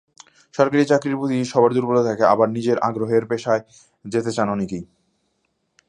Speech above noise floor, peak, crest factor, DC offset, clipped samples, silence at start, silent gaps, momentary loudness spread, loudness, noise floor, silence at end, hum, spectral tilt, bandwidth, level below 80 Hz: 51 dB; 0 dBFS; 20 dB; under 0.1%; under 0.1%; 0.55 s; none; 9 LU; -20 LUFS; -70 dBFS; 1.05 s; none; -6.5 dB/octave; 11 kHz; -60 dBFS